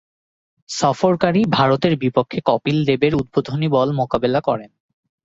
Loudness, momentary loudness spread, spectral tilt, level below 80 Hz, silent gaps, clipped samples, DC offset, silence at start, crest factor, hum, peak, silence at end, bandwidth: -18 LUFS; 5 LU; -6.5 dB/octave; -50 dBFS; none; under 0.1%; under 0.1%; 0.7 s; 16 dB; none; -2 dBFS; 0.6 s; 8 kHz